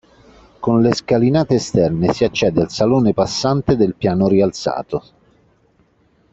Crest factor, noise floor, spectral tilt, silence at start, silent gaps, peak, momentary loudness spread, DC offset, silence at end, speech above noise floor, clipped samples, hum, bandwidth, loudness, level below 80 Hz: 16 dB; -57 dBFS; -6.5 dB/octave; 0.6 s; none; -2 dBFS; 7 LU; under 0.1%; 1.35 s; 42 dB; under 0.1%; none; 8 kHz; -17 LUFS; -46 dBFS